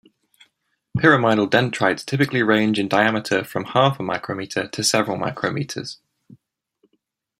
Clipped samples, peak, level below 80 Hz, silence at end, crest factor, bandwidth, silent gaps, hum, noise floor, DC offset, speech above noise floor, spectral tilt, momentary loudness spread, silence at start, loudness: under 0.1%; -2 dBFS; -60 dBFS; 1.45 s; 20 dB; 16 kHz; none; none; -72 dBFS; under 0.1%; 52 dB; -4.5 dB/octave; 10 LU; 0.95 s; -20 LUFS